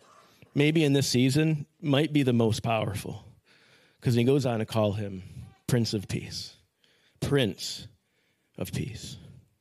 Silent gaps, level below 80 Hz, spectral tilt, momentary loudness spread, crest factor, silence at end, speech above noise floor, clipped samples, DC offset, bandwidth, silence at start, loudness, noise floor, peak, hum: none; -62 dBFS; -6 dB/octave; 17 LU; 20 dB; 0.3 s; 45 dB; under 0.1%; under 0.1%; 15 kHz; 0.55 s; -27 LUFS; -72 dBFS; -8 dBFS; none